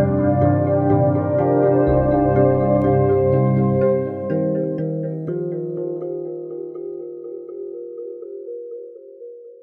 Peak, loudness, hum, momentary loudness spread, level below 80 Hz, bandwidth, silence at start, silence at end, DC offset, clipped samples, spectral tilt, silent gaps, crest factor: -4 dBFS; -19 LUFS; 50 Hz at -55 dBFS; 16 LU; -40 dBFS; 3.2 kHz; 0 s; 0.1 s; under 0.1%; under 0.1%; -13 dB/octave; none; 14 dB